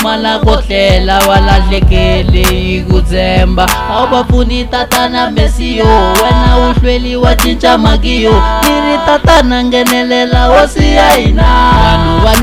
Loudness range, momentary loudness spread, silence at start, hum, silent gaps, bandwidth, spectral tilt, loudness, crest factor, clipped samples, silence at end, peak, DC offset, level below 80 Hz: 3 LU; 4 LU; 0 s; none; none; 16 kHz; -5 dB/octave; -9 LUFS; 8 dB; 2%; 0 s; 0 dBFS; 0.2%; -12 dBFS